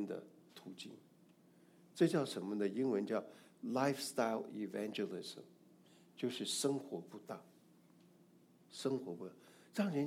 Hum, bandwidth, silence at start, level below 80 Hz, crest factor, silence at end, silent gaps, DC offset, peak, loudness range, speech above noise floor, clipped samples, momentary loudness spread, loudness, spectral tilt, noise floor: none; 16.5 kHz; 0 s; under -90 dBFS; 22 dB; 0 s; none; under 0.1%; -20 dBFS; 6 LU; 27 dB; under 0.1%; 18 LU; -40 LUFS; -5 dB/octave; -67 dBFS